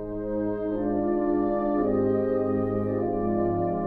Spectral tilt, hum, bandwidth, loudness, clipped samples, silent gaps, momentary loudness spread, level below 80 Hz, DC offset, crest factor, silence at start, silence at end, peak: -12 dB/octave; none; 4.3 kHz; -26 LUFS; under 0.1%; none; 4 LU; -46 dBFS; under 0.1%; 12 dB; 0 s; 0 s; -14 dBFS